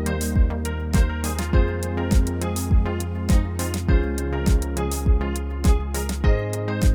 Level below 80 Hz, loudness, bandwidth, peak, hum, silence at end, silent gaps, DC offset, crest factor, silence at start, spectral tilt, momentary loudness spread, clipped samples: -24 dBFS; -23 LUFS; over 20 kHz; -6 dBFS; none; 0 s; none; under 0.1%; 14 dB; 0 s; -6 dB/octave; 4 LU; under 0.1%